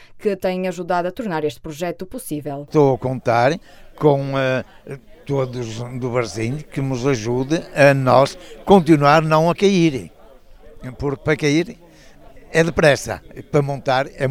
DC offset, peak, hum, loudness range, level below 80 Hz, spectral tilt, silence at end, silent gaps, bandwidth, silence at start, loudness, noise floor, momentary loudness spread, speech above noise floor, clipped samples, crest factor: under 0.1%; 0 dBFS; none; 7 LU; -44 dBFS; -6 dB/octave; 0 s; none; 16 kHz; 0.1 s; -19 LUFS; -44 dBFS; 14 LU; 26 dB; under 0.1%; 18 dB